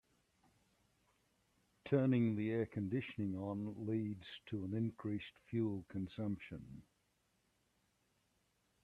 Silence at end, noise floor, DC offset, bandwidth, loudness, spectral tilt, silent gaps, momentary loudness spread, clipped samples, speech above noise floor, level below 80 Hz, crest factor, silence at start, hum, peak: 2 s; -80 dBFS; under 0.1%; 9.8 kHz; -41 LUFS; -9 dB/octave; none; 15 LU; under 0.1%; 40 dB; -74 dBFS; 22 dB; 1.85 s; 60 Hz at -70 dBFS; -22 dBFS